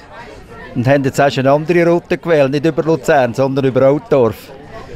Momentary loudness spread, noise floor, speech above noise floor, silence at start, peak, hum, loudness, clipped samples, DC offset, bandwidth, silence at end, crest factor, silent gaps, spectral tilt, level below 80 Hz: 21 LU; -34 dBFS; 21 dB; 0.1 s; -2 dBFS; none; -13 LUFS; under 0.1%; under 0.1%; 15.5 kHz; 0 s; 12 dB; none; -7 dB/octave; -46 dBFS